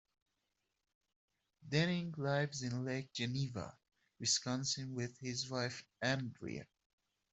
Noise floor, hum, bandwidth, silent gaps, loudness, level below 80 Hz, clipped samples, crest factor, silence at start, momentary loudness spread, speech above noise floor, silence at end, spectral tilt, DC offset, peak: -86 dBFS; none; 8.2 kHz; none; -39 LUFS; -74 dBFS; under 0.1%; 22 dB; 1.6 s; 10 LU; 47 dB; 0.7 s; -4 dB/octave; under 0.1%; -20 dBFS